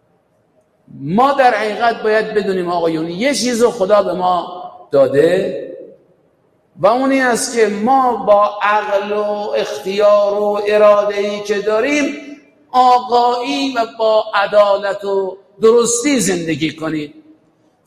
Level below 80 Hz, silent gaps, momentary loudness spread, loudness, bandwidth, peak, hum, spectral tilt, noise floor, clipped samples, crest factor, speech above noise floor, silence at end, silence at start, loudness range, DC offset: -56 dBFS; none; 8 LU; -14 LUFS; 15 kHz; 0 dBFS; none; -4 dB/octave; -58 dBFS; under 0.1%; 14 dB; 44 dB; 0.65 s; 0.95 s; 2 LU; under 0.1%